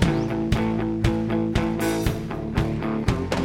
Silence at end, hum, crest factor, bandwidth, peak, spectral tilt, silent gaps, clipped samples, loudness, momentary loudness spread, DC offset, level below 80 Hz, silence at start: 0 s; none; 18 dB; 16.5 kHz; -6 dBFS; -6.5 dB/octave; none; under 0.1%; -24 LUFS; 3 LU; under 0.1%; -34 dBFS; 0 s